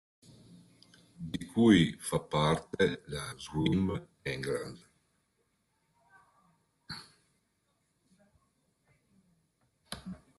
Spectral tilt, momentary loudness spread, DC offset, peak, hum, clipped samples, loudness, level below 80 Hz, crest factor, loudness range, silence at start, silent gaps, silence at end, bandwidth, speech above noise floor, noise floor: -5.5 dB/octave; 21 LU; under 0.1%; -12 dBFS; none; under 0.1%; -31 LUFS; -62 dBFS; 24 dB; 24 LU; 1.2 s; none; 0.25 s; 12.5 kHz; 47 dB; -77 dBFS